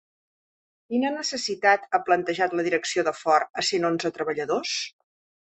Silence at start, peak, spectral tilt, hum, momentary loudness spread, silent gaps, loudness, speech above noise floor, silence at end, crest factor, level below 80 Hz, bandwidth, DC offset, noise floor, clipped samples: 0.9 s; -6 dBFS; -3 dB/octave; none; 7 LU; 3.50-3.54 s; -24 LUFS; over 66 dB; 0.55 s; 20 dB; -72 dBFS; 8.6 kHz; under 0.1%; under -90 dBFS; under 0.1%